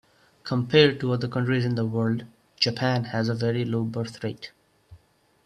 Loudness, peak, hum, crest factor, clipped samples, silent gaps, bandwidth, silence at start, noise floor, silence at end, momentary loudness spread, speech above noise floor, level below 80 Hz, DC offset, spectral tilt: -25 LUFS; -4 dBFS; none; 22 dB; under 0.1%; none; 10.5 kHz; 0.45 s; -61 dBFS; 0.5 s; 14 LU; 36 dB; -62 dBFS; under 0.1%; -6.5 dB/octave